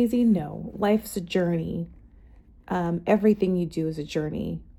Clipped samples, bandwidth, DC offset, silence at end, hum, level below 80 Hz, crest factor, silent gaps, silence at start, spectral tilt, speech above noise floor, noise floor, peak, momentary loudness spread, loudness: under 0.1%; 17 kHz; under 0.1%; 0.05 s; none; -50 dBFS; 18 dB; none; 0 s; -7 dB/octave; 27 dB; -51 dBFS; -8 dBFS; 11 LU; -26 LUFS